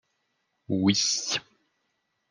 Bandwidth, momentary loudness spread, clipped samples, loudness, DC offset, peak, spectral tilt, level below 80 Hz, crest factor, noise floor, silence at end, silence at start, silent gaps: 11 kHz; 9 LU; under 0.1%; -25 LUFS; under 0.1%; -10 dBFS; -3 dB/octave; -72 dBFS; 20 dB; -77 dBFS; 0.9 s; 0.7 s; none